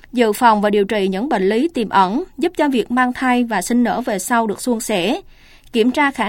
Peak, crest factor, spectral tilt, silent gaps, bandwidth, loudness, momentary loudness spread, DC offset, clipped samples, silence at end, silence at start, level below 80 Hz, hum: 0 dBFS; 16 dB; -4.5 dB/octave; none; 17 kHz; -17 LUFS; 7 LU; under 0.1%; under 0.1%; 0 s; 0.15 s; -48 dBFS; none